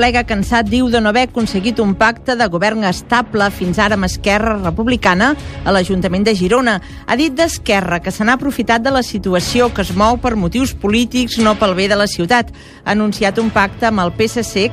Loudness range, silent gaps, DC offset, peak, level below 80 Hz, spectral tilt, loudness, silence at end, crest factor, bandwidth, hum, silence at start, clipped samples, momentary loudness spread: 1 LU; none; under 0.1%; 0 dBFS; -32 dBFS; -5 dB/octave; -14 LUFS; 0 s; 14 dB; 15.5 kHz; none; 0 s; under 0.1%; 4 LU